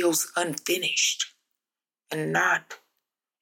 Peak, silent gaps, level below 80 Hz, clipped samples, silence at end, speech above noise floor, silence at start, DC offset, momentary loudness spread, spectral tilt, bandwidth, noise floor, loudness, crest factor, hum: -10 dBFS; none; -84 dBFS; under 0.1%; 0.65 s; over 64 dB; 0 s; under 0.1%; 12 LU; -2 dB/octave; 17 kHz; under -90 dBFS; -25 LUFS; 18 dB; none